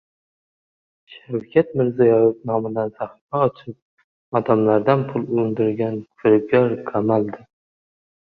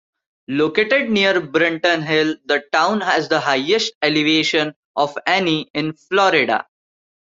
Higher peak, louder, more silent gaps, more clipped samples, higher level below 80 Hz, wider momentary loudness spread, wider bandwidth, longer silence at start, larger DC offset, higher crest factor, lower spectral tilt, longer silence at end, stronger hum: about the same, -2 dBFS vs -2 dBFS; second, -20 LUFS vs -17 LUFS; first, 3.21-3.28 s, 3.82-3.97 s, 4.04-4.32 s vs 3.95-4.01 s, 4.76-4.94 s, 5.70-5.74 s; neither; about the same, -60 dBFS vs -62 dBFS; first, 13 LU vs 7 LU; second, 4.7 kHz vs 7.8 kHz; first, 1.1 s vs 0.5 s; neither; about the same, 18 dB vs 16 dB; first, -10.5 dB/octave vs -4 dB/octave; first, 0.9 s vs 0.6 s; neither